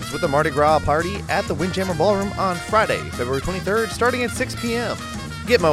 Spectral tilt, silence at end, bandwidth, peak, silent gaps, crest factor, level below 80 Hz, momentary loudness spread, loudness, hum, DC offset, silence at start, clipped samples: -5 dB/octave; 0 s; 16 kHz; -2 dBFS; none; 20 dB; -40 dBFS; 7 LU; -21 LUFS; none; under 0.1%; 0 s; under 0.1%